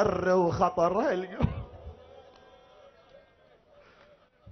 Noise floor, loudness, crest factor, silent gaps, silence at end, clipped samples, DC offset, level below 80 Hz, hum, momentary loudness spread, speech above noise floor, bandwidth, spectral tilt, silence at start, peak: -61 dBFS; -27 LUFS; 20 dB; none; 0 s; under 0.1%; under 0.1%; -48 dBFS; none; 23 LU; 35 dB; 6.4 kHz; -7.5 dB/octave; 0 s; -12 dBFS